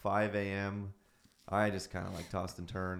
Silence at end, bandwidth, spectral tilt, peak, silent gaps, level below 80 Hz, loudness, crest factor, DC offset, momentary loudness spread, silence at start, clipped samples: 0 s; 15 kHz; -6 dB/octave; -18 dBFS; none; -60 dBFS; -37 LUFS; 20 dB; under 0.1%; 9 LU; 0 s; under 0.1%